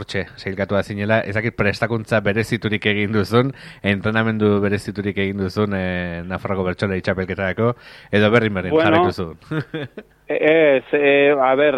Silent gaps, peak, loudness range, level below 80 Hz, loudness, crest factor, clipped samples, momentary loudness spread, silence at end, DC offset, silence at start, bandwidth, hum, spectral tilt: none; 0 dBFS; 4 LU; -50 dBFS; -19 LUFS; 18 dB; under 0.1%; 11 LU; 0 s; under 0.1%; 0 s; 13.5 kHz; none; -7 dB/octave